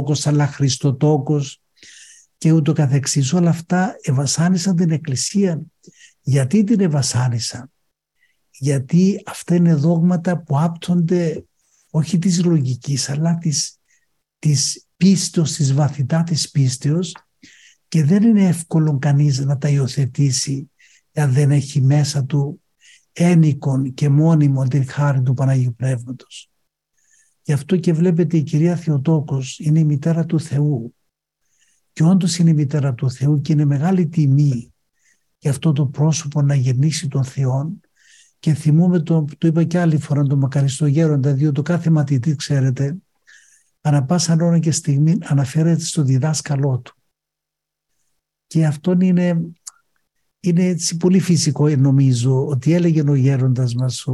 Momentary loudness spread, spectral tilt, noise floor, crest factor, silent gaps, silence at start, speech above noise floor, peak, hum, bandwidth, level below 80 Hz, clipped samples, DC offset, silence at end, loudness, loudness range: 7 LU; -6.5 dB/octave; -83 dBFS; 14 dB; none; 0 s; 67 dB; -4 dBFS; none; 12 kHz; -60 dBFS; under 0.1%; under 0.1%; 0 s; -17 LUFS; 3 LU